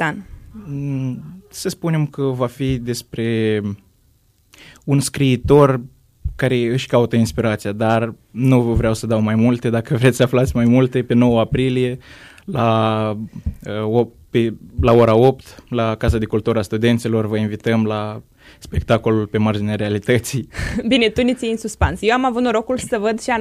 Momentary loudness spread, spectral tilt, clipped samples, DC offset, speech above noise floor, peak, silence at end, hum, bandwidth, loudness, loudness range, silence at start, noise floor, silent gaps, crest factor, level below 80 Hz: 12 LU; -6.5 dB/octave; under 0.1%; under 0.1%; 39 dB; 0 dBFS; 0 s; none; 15.5 kHz; -18 LUFS; 5 LU; 0 s; -57 dBFS; none; 16 dB; -36 dBFS